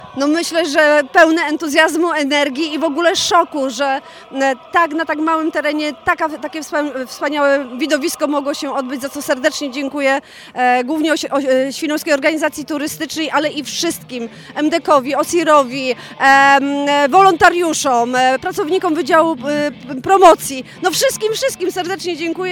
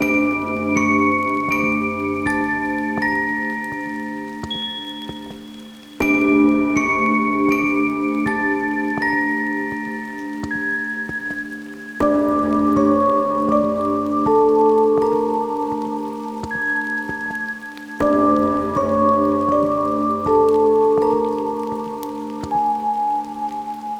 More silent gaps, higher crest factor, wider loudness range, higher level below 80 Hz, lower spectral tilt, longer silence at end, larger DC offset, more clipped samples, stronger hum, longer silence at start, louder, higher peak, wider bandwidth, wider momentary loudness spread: neither; about the same, 16 dB vs 16 dB; about the same, 6 LU vs 6 LU; about the same, -54 dBFS vs -50 dBFS; second, -2.5 dB/octave vs -6 dB/octave; about the same, 0 s vs 0 s; neither; first, 0.2% vs under 0.1%; neither; about the same, 0 s vs 0 s; first, -15 LUFS vs -19 LUFS; first, 0 dBFS vs -4 dBFS; first, 18.5 kHz vs 13.5 kHz; about the same, 11 LU vs 12 LU